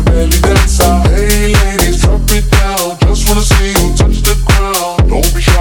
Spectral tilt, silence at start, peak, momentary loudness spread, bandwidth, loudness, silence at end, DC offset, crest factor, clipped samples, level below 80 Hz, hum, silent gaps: -4.5 dB/octave; 0 s; 0 dBFS; 3 LU; 19.5 kHz; -10 LUFS; 0 s; under 0.1%; 8 dB; 0.3%; -10 dBFS; none; none